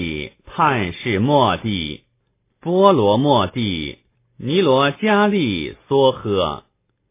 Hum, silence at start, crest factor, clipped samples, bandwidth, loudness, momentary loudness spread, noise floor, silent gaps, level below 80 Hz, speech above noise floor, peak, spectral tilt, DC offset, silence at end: none; 0 s; 18 dB; under 0.1%; 3.9 kHz; -18 LUFS; 14 LU; -67 dBFS; none; -44 dBFS; 50 dB; 0 dBFS; -10.5 dB/octave; under 0.1%; 0.55 s